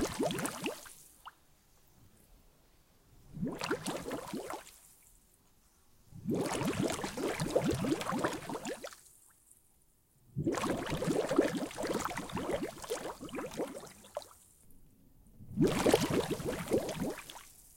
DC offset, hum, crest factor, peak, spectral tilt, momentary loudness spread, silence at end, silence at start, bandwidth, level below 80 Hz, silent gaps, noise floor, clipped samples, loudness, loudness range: under 0.1%; none; 26 dB; -12 dBFS; -5 dB/octave; 18 LU; 0 s; 0 s; 17 kHz; -58 dBFS; none; -68 dBFS; under 0.1%; -36 LUFS; 8 LU